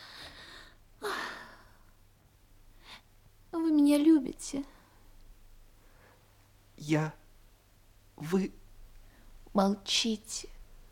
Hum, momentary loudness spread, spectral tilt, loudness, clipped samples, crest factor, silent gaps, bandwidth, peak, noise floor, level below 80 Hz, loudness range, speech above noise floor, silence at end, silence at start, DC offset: none; 26 LU; -4.5 dB/octave; -30 LUFS; under 0.1%; 22 dB; none; 16.5 kHz; -12 dBFS; -62 dBFS; -58 dBFS; 9 LU; 30 dB; 0.15 s; 0 s; under 0.1%